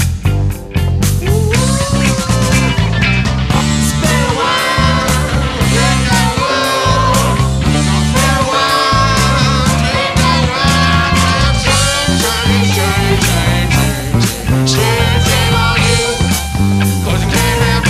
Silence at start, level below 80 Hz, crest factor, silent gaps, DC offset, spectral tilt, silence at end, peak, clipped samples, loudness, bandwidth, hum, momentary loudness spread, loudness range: 0 s; -22 dBFS; 12 dB; none; under 0.1%; -4.5 dB/octave; 0 s; 0 dBFS; under 0.1%; -12 LUFS; 15.5 kHz; none; 3 LU; 1 LU